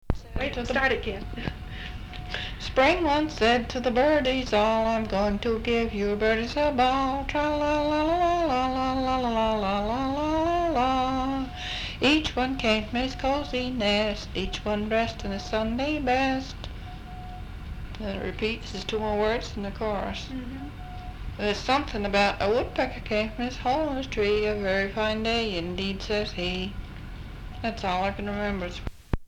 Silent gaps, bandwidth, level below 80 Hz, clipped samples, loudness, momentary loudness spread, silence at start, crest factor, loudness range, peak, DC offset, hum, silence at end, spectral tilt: none; 17 kHz; -38 dBFS; under 0.1%; -26 LUFS; 15 LU; 0.05 s; 20 dB; 6 LU; -8 dBFS; under 0.1%; none; 0 s; -5.5 dB/octave